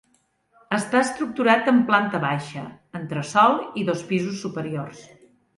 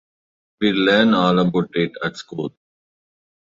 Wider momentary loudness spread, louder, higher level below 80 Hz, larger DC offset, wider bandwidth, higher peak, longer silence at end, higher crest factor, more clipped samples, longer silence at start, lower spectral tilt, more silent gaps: about the same, 16 LU vs 14 LU; second, -22 LUFS vs -18 LUFS; second, -68 dBFS vs -58 dBFS; neither; first, 11.5 kHz vs 7.8 kHz; about the same, -4 dBFS vs -2 dBFS; second, 0.55 s vs 0.95 s; about the same, 20 dB vs 18 dB; neither; about the same, 0.7 s vs 0.6 s; about the same, -5.5 dB/octave vs -6.5 dB/octave; neither